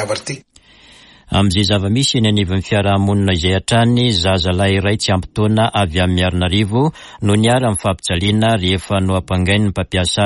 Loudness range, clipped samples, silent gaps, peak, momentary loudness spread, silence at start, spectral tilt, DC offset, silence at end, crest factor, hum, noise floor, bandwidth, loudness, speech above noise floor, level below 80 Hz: 1 LU; under 0.1%; none; -4 dBFS; 4 LU; 0 s; -5.5 dB/octave; under 0.1%; 0 s; 12 dB; none; -45 dBFS; 11.5 kHz; -15 LUFS; 30 dB; -36 dBFS